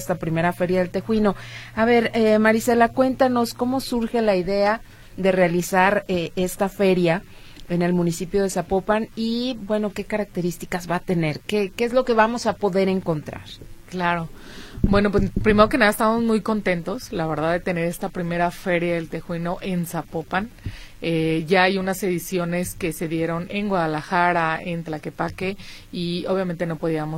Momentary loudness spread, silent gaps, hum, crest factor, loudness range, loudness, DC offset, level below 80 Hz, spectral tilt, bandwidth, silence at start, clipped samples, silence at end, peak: 11 LU; none; none; 20 dB; 5 LU; -22 LUFS; under 0.1%; -40 dBFS; -6 dB/octave; 16.5 kHz; 0 s; under 0.1%; 0 s; 0 dBFS